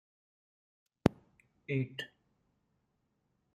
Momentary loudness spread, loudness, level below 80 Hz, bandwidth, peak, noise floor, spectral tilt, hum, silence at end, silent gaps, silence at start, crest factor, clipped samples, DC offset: 15 LU; -36 LUFS; -60 dBFS; 13.5 kHz; -6 dBFS; -79 dBFS; -7 dB/octave; none; 1.5 s; none; 1.05 s; 34 dB; under 0.1%; under 0.1%